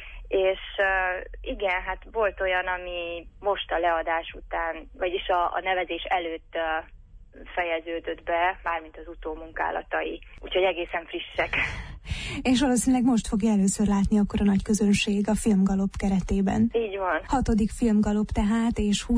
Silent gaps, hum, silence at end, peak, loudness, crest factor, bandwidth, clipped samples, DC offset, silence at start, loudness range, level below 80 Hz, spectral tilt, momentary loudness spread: none; none; 0 s; -12 dBFS; -26 LUFS; 14 dB; 11 kHz; under 0.1%; under 0.1%; 0 s; 6 LU; -40 dBFS; -5 dB/octave; 10 LU